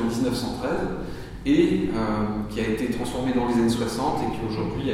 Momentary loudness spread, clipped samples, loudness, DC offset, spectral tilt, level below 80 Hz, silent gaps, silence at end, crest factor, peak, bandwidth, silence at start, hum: 7 LU; under 0.1%; -25 LUFS; under 0.1%; -6 dB/octave; -40 dBFS; none; 0 s; 18 dB; -8 dBFS; 16 kHz; 0 s; none